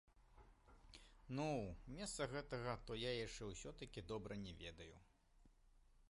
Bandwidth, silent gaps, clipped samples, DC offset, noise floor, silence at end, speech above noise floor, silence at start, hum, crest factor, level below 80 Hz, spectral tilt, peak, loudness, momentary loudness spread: 11.5 kHz; none; under 0.1%; under 0.1%; -72 dBFS; 0.05 s; 23 dB; 0.15 s; none; 20 dB; -64 dBFS; -4.5 dB/octave; -32 dBFS; -49 LUFS; 16 LU